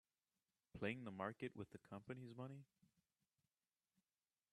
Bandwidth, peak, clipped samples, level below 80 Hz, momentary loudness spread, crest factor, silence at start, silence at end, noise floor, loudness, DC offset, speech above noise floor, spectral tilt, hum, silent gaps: 12 kHz; -30 dBFS; under 0.1%; -82 dBFS; 10 LU; 26 dB; 0.75 s; 1.9 s; under -90 dBFS; -52 LUFS; under 0.1%; over 38 dB; -7 dB/octave; none; none